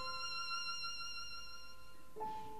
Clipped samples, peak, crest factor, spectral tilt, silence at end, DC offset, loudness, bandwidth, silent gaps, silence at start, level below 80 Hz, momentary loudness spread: under 0.1%; -32 dBFS; 14 dB; -1 dB/octave; 0 s; 0.4%; -43 LUFS; 14 kHz; none; 0 s; -68 dBFS; 16 LU